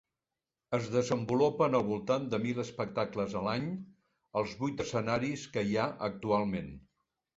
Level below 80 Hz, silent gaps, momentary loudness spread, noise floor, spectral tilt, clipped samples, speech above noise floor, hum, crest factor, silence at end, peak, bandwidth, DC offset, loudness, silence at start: -62 dBFS; none; 8 LU; under -90 dBFS; -6 dB/octave; under 0.1%; over 58 dB; none; 18 dB; 0.6 s; -14 dBFS; 8 kHz; under 0.1%; -33 LUFS; 0.7 s